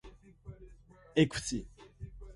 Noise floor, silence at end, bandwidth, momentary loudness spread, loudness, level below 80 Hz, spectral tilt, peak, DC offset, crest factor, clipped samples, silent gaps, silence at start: -57 dBFS; 0 s; 11.5 kHz; 25 LU; -33 LUFS; -52 dBFS; -5 dB/octave; -12 dBFS; under 0.1%; 24 dB; under 0.1%; none; 0.05 s